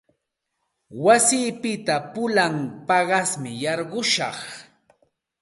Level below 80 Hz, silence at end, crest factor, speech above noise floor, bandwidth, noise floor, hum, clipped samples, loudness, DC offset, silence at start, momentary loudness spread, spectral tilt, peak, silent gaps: -70 dBFS; 0.8 s; 20 dB; 56 dB; 12 kHz; -78 dBFS; none; under 0.1%; -21 LUFS; under 0.1%; 0.9 s; 13 LU; -3 dB/octave; -4 dBFS; none